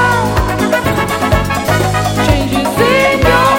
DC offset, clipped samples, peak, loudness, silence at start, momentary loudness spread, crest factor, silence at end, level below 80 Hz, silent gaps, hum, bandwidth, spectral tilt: under 0.1%; under 0.1%; 0 dBFS; -12 LUFS; 0 s; 4 LU; 12 dB; 0 s; -24 dBFS; none; none; 17 kHz; -5 dB/octave